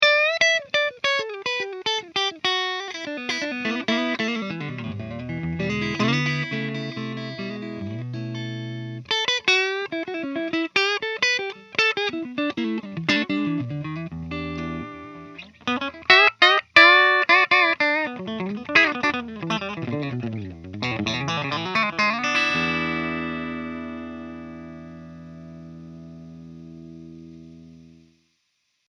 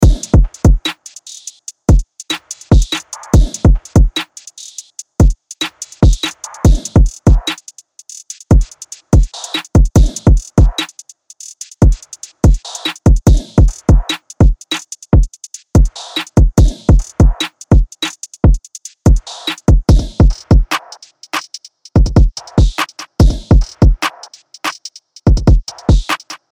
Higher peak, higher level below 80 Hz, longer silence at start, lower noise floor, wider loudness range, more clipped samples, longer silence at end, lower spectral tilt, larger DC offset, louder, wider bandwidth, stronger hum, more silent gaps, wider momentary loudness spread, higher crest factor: about the same, 0 dBFS vs -2 dBFS; second, -56 dBFS vs -14 dBFS; about the same, 0 s vs 0 s; first, -72 dBFS vs -39 dBFS; first, 14 LU vs 2 LU; neither; first, 1 s vs 0.2 s; second, -4 dB/octave vs -5.5 dB/octave; neither; second, -22 LUFS vs -14 LUFS; second, 11 kHz vs 13 kHz; first, 60 Hz at -60 dBFS vs none; neither; first, 23 LU vs 18 LU; first, 24 dB vs 10 dB